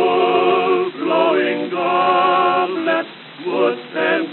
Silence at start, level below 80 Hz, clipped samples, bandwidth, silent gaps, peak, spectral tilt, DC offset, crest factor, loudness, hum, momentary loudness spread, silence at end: 0 s; under -90 dBFS; under 0.1%; 4.3 kHz; none; -4 dBFS; -2 dB/octave; under 0.1%; 14 dB; -17 LUFS; none; 6 LU; 0 s